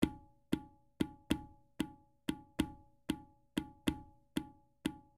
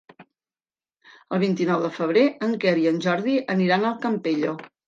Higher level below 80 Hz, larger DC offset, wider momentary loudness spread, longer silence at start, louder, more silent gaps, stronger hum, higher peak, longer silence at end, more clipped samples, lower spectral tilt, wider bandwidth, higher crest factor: first, -58 dBFS vs -74 dBFS; neither; first, 11 LU vs 5 LU; second, 0 s vs 0.2 s; second, -42 LUFS vs -23 LUFS; neither; neither; second, -16 dBFS vs -8 dBFS; about the same, 0.15 s vs 0.2 s; neither; second, -5.5 dB/octave vs -7 dB/octave; first, 15 kHz vs 7.6 kHz; first, 26 dB vs 16 dB